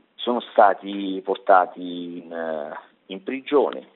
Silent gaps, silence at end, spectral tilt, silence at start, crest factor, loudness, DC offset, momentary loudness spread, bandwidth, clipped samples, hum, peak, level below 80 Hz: none; 0.1 s; -2.5 dB/octave; 0.2 s; 22 dB; -22 LUFS; under 0.1%; 16 LU; 4.2 kHz; under 0.1%; none; -2 dBFS; -78 dBFS